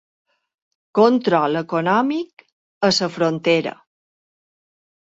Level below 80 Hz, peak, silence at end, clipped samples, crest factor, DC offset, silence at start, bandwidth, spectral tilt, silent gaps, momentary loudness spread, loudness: -66 dBFS; -2 dBFS; 1.4 s; under 0.1%; 18 dB; under 0.1%; 0.95 s; 8 kHz; -5 dB/octave; 2.33-2.37 s, 2.52-2.81 s; 9 LU; -19 LUFS